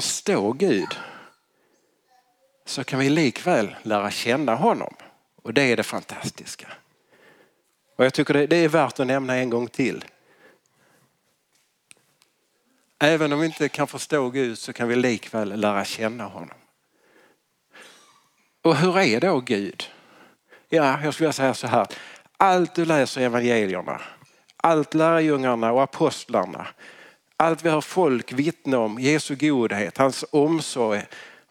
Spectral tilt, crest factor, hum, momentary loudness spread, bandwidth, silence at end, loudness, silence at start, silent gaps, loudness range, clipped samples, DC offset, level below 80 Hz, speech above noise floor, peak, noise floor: -5 dB/octave; 22 dB; none; 16 LU; 16.5 kHz; 0.25 s; -22 LUFS; 0 s; none; 6 LU; under 0.1%; under 0.1%; -72 dBFS; 46 dB; -2 dBFS; -68 dBFS